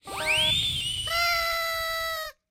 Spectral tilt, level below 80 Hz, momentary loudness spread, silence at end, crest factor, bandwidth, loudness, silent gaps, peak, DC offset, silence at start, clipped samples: -1 dB/octave; -48 dBFS; 8 LU; 0.2 s; 14 dB; 16 kHz; -25 LUFS; none; -12 dBFS; under 0.1%; 0.05 s; under 0.1%